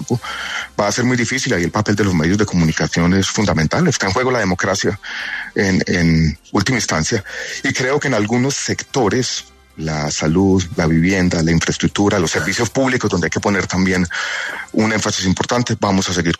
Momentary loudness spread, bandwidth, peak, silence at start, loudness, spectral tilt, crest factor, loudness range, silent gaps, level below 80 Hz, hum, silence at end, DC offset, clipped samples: 6 LU; 13.5 kHz; -4 dBFS; 0 s; -17 LUFS; -4.5 dB/octave; 14 dB; 2 LU; none; -38 dBFS; none; 0.05 s; under 0.1%; under 0.1%